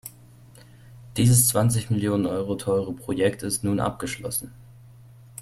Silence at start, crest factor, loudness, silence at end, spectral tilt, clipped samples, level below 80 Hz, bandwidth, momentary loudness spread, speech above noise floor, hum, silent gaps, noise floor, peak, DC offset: 0.05 s; 20 dB; -23 LUFS; 0 s; -5 dB/octave; under 0.1%; -52 dBFS; 16 kHz; 15 LU; 26 dB; none; none; -49 dBFS; -4 dBFS; under 0.1%